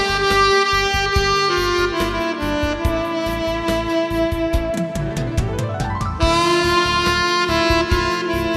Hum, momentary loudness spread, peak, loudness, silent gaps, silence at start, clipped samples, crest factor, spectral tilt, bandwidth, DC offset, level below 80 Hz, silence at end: none; 7 LU; -2 dBFS; -18 LUFS; none; 0 s; under 0.1%; 16 dB; -4.5 dB/octave; 14 kHz; under 0.1%; -30 dBFS; 0 s